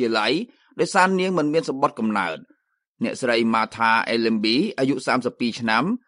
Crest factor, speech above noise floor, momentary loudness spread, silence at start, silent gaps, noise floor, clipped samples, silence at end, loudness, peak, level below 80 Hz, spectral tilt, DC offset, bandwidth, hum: 18 dB; 42 dB; 8 LU; 0 s; 2.87-2.95 s; -63 dBFS; under 0.1%; 0.1 s; -21 LUFS; -4 dBFS; -68 dBFS; -4.5 dB/octave; under 0.1%; 11 kHz; none